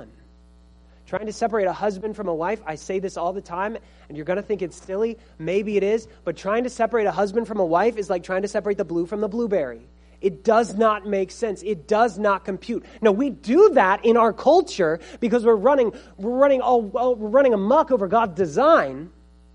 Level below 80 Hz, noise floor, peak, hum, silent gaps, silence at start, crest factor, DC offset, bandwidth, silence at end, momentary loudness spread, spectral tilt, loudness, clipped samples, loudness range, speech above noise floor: -52 dBFS; -51 dBFS; -4 dBFS; none; none; 0 s; 18 dB; under 0.1%; 10.5 kHz; 0.45 s; 12 LU; -6 dB/octave; -21 LUFS; under 0.1%; 8 LU; 30 dB